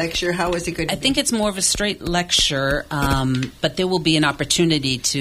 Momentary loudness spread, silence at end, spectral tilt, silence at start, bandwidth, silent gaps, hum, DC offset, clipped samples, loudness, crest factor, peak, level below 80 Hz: 6 LU; 0 s; -3.5 dB/octave; 0 s; 16.5 kHz; none; none; under 0.1%; under 0.1%; -19 LUFS; 16 dB; -4 dBFS; -36 dBFS